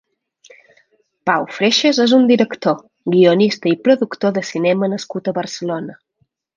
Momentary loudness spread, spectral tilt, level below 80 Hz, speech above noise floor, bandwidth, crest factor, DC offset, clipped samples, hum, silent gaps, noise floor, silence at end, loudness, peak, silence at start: 11 LU; -5 dB/octave; -66 dBFS; 50 dB; 7.6 kHz; 16 dB; under 0.1%; under 0.1%; none; none; -65 dBFS; 0.65 s; -16 LUFS; 0 dBFS; 1.25 s